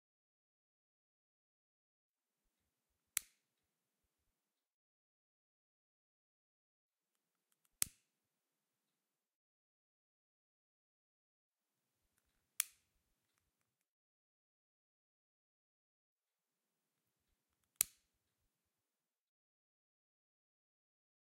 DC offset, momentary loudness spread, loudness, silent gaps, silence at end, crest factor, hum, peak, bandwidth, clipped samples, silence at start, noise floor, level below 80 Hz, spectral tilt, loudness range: under 0.1%; 5 LU; -42 LUFS; 4.73-6.89 s, 9.35-11.52 s, 13.88-16.16 s; 3.55 s; 44 dB; none; -12 dBFS; 12 kHz; under 0.1%; 3.15 s; under -90 dBFS; -88 dBFS; 1.5 dB/octave; 5 LU